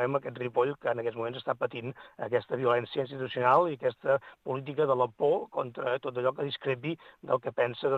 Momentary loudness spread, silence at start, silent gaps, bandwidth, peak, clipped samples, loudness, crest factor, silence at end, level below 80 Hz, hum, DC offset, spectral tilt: 9 LU; 0 s; none; 4.9 kHz; -10 dBFS; under 0.1%; -30 LUFS; 20 dB; 0 s; -76 dBFS; none; under 0.1%; -8 dB/octave